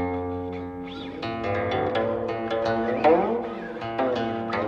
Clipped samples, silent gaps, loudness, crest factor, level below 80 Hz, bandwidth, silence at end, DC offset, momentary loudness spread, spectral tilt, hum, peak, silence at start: under 0.1%; none; -26 LUFS; 18 dB; -52 dBFS; 7.2 kHz; 0 s; under 0.1%; 13 LU; -7.5 dB/octave; none; -6 dBFS; 0 s